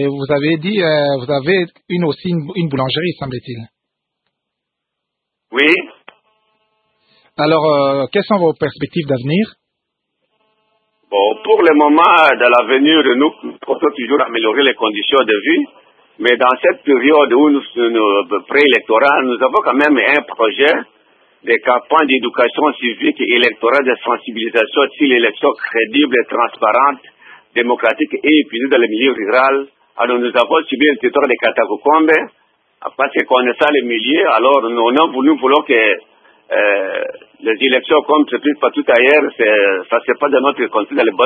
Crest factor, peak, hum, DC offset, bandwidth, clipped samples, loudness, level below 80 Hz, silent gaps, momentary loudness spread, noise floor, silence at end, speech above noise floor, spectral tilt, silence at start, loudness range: 14 dB; 0 dBFS; none; under 0.1%; 4.8 kHz; under 0.1%; -13 LUFS; -62 dBFS; none; 9 LU; -78 dBFS; 0 s; 65 dB; -7 dB/octave; 0 s; 7 LU